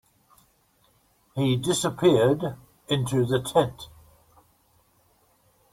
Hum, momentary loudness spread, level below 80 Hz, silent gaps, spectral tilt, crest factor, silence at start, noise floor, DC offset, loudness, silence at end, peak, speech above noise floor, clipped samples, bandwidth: none; 18 LU; -58 dBFS; none; -5.5 dB/octave; 20 dB; 1.35 s; -64 dBFS; under 0.1%; -24 LUFS; 1.85 s; -8 dBFS; 41 dB; under 0.1%; 16.5 kHz